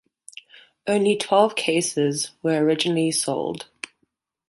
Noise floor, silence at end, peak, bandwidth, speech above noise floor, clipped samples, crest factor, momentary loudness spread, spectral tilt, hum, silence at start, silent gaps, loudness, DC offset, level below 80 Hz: -72 dBFS; 0.85 s; -4 dBFS; 12 kHz; 51 dB; under 0.1%; 20 dB; 20 LU; -4 dB/octave; none; 0.85 s; none; -22 LUFS; under 0.1%; -68 dBFS